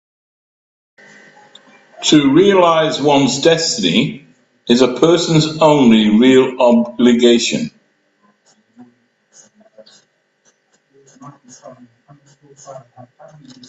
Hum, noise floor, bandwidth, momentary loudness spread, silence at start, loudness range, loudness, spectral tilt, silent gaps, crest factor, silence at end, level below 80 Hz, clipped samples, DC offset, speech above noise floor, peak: none; -59 dBFS; 8.4 kHz; 7 LU; 2 s; 6 LU; -12 LUFS; -4.5 dB/octave; none; 16 dB; 0.9 s; -56 dBFS; under 0.1%; under 0.1%; 46 dB; 0 dBFS